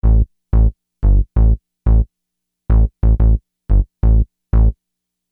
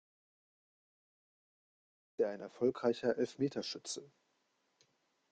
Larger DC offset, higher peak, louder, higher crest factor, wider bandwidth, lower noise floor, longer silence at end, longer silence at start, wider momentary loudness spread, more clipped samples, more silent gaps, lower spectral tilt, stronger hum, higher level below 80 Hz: neither; first, -4 dBFS vs -20 dBFS; first, -17 LUFS vs -37 LUFS; second, 12 dB vs 22 dB; second, 1.9 kHz vs 9.4 kHz; about the same, -78 dBFS vs -80 dBFS; second, 0.6 s vs 1.25 s; second, 0.05 s vs 2.2 s; second, 5 LU vs 10 LU; neither; neither; first, -13 dB/octave vs -4.5 dB/octave; neither; first, -14 dBFS vs -82 dBFS